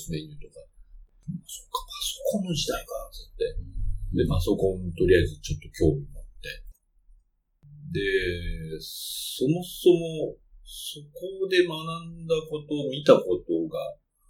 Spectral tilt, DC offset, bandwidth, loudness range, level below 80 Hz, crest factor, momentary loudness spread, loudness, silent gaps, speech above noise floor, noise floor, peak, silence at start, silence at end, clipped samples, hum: -5.5 dB/octave; under 0.1%; 17.5 kHz; 6 LU; -40 dBFS; 24 dB; 17 LU; -27 LUFS; none; 37 dB; -63 dBFS; -4 dBFS; 0 s; 0.35 s; under 0.1%; none